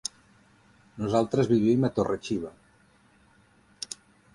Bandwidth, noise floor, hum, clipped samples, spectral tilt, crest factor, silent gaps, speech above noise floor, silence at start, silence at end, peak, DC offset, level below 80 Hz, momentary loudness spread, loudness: 11.5 kHz; -61 dBFS; none; under 0.1%; -6 dB/octave; 20 dB; none; 36 dB; 0.95 s; 0.4 s; -10 dBFS; under 0.1%; -58 dBFS; 17 LU; -27 LUFS